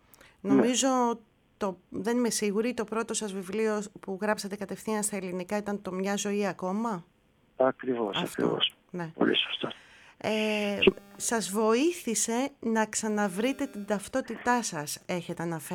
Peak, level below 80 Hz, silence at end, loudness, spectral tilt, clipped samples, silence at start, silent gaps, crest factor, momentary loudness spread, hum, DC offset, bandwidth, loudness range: -8 dBFS; -64 dBFS; 0 s; -29 LUFS; -3.5 dB/octave; under 0.1%; 0.45 s; none; 22 dB; 10 LU; none; under 0.1%; 19 kHz; 4 LU